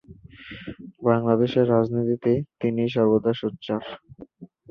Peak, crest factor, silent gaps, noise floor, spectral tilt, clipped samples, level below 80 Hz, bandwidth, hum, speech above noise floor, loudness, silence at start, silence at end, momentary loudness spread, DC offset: -4 dBFS; 18 dB; none; -46 dBFS; -9.5 dB/octave; under 0.1%; -58 dBFS; 6.2 kHz; none; 23 dB; -23 LUFS; 0.1 s; 0.25 s; 19 LU; under 0.1%